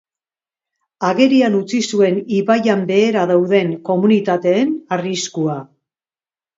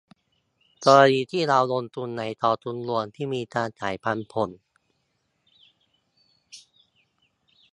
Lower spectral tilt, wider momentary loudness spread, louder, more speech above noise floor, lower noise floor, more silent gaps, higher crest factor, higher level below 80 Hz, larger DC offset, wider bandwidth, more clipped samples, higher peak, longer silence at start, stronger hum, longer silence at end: about the same, -5.5 dB/octave vs -5 dB/octave; second, 8 LU vs 14 LU; first, -16 LUFS vs -24 LUFS; first, over 75 dB vs 50 dB; first, under -90 dBFS vs -73 dBFS; neither; second, 16 dB vs 24 dB; about the same, -66 dBFS vs -68 dBFS; neither; second, 7.8 kHz vs 11.5 kHz; neither; about the same, 0 dBFS vs -2 dBFS; first, 1 s vs 0.8 s; neither; second, 0.9 s vs 1.15 s